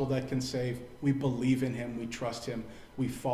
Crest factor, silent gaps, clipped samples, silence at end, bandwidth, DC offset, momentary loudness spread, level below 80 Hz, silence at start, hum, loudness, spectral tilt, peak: 16 dB; none; under 0.1%; 0 s; 15.5 kHz; under 0.1%; 9 LU; -58 dBFS; 0 s; none; -33 LUFS; -6.5 dB/octave; -18 dBFS